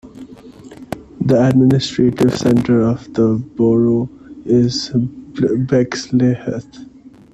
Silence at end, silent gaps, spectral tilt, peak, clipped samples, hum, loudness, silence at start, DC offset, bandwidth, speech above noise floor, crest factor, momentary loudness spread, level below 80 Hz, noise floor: 0.5 s; none; -7 dB/octave; 0 dBFS; under 0.1%; none; -15 LUFS; 0.05 s; under 0.1%; 11 kHz; 23 dB; 16 dB; 13 LU; -46 dBFS; -38 dBFS